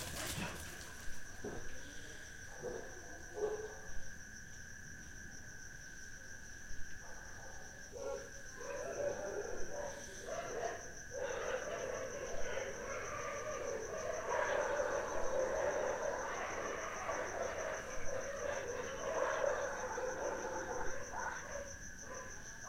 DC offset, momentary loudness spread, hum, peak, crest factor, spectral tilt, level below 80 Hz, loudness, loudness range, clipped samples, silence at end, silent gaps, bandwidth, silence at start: under 0.1%; 13 LU; none; -24 dBFS; 18 dB; -3 dB/octave; -56 dBFS; -43 LUFS; 11 LU; under 0.1%; 0 s; none; 16.5 kHz; 0 s